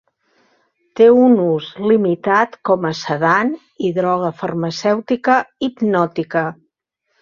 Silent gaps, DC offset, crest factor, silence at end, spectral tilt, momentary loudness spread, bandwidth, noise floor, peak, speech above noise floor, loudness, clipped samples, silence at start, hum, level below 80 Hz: none; under 0.1%; 16 dB; 0.7 s; -6.5 dB/octave; 10 LU; 7.2 kHz; -71 dBFS; -2 dBFS; 55 dB; -16 LUFS; under 0.1%; 0.95 s; none; -60 dBFS